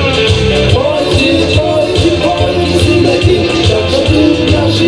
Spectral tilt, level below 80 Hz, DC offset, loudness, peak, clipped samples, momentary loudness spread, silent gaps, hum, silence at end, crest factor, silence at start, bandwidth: -5.5 dB/octave; -24 dBFS; under 0.1%; -10 LUFS; 0 dBFS; 0.2%; 2 LU; none; none; 0 s; 10 dB; 0 s; 11 kHz